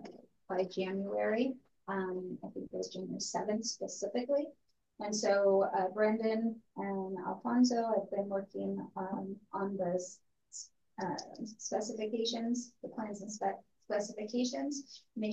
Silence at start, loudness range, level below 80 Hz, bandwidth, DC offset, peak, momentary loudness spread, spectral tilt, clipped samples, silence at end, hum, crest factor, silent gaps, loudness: 0 s; 7 LU; -82 dBFS; 8.8 kHz; under 0.1%; -18 dBFS; 14 LU; -4.5 dB/octave; under 0.1%; 0 s; none; 18 dB; none; -36 LUFS